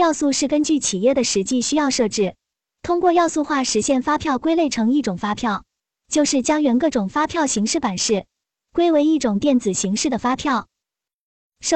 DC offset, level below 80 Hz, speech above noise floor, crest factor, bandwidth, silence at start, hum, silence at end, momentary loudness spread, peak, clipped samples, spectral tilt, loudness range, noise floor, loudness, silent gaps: under 0.1%; -52 dBFS; 67 dB; 14 dB; 9.8 kHz; 0 s; none; 0 s; 6 LU; -6 dBFS; under 0.1%; -3.5 dB/octave; 1 LU; -86 dBFS; -19 LUFS; 11.14-11.50 s